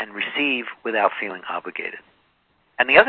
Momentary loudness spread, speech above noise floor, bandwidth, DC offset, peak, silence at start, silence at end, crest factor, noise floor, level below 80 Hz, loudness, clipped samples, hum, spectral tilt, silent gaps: 12 LU; 43 dB; 5.6 kHz; under 0.1%; 0 dBFS; 0 s; 0 s; 22 dB; -64 dBFS; -62 dBFS; -23 LUFS; under 0.1%; none; -6.5 dB/octave; none